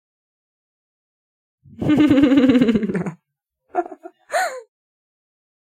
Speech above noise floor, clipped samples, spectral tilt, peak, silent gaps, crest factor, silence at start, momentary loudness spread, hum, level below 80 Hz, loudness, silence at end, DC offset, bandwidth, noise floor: 62 dB; under 0.1%; -6.5 dB/octave; -4 dBFS; none; 18 dB; 1.8 s; 15 LU; none; -52 dBFS; -18 LUFS; 1.05 s; under 0.1%; 13.5 kHz; -77 dBFS